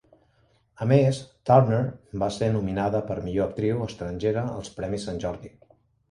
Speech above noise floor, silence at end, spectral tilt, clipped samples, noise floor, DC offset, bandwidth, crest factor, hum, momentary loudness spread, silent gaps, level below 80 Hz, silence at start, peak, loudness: 40 dB; 0.65 s; -7.5 dB/octave; under 0.1%; -64 dBFS; under 0.1%; 10.5 kHz; 22 dB; none; 12 LU; none; -50 dBFS; 0.8 s; -4 dBFS; -25 LUFS